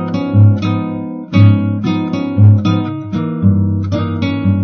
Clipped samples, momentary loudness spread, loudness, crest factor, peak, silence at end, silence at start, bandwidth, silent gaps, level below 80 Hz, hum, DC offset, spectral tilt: 0.1%; 9 LU; -14 LUFS; 12 dB; 0 dBFS; 0 s; 0 s; 6 kHz; none; -46 dBFS; none; under 0.1%; -9 dB/octave